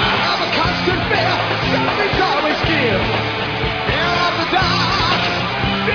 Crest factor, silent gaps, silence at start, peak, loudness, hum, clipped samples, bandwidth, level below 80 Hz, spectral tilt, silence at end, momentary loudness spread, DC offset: 14 dB; none; 0 s; -4 dBFS; -16 LUFS; none; under 0.1%; 5.4 kHz; -34 dBFS; -5 dB/octave; 0 s; 3 LU; under 0.1%